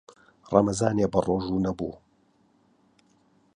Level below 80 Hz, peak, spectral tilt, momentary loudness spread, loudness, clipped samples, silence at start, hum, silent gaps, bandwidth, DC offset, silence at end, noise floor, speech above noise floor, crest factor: -52 dBFS; -4 dBFS; -6.5 dB/octave; 9 LU; -26 LUFS; under 0.1%; 0.45 s; none; none; 11 kHz; under 0.1%; 1.6 s; -65 dBFS; 40 dB; 24 dB